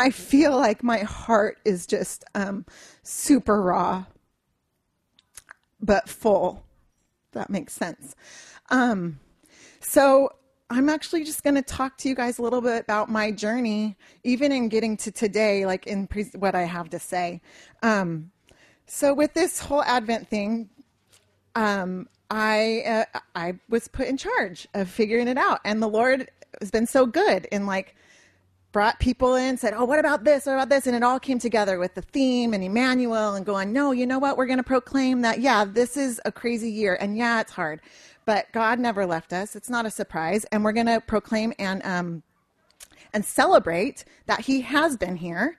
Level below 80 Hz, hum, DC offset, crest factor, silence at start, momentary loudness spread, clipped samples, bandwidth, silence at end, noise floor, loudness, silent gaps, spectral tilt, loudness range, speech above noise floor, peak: -50 dBFS; none; under 0.1%; 20 dB; 0 s; 11 LU; under 0.1%; 14 kHz; 0.05 s; -74 dBFS; -24 LUFS; none; -4.5 dB/octave; 4 LU; 51 dB; -4 dBFS